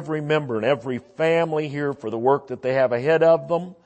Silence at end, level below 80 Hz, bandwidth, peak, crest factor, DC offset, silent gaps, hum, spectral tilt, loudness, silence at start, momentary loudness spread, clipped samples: 0.1 s; -66 dBFS; 8.6 kHz; -6 dBFS; 16 dB; under 0.1%; none; none; -7 dB/octave; -22 LUFS; 0 s; 9 LU; under 0.1%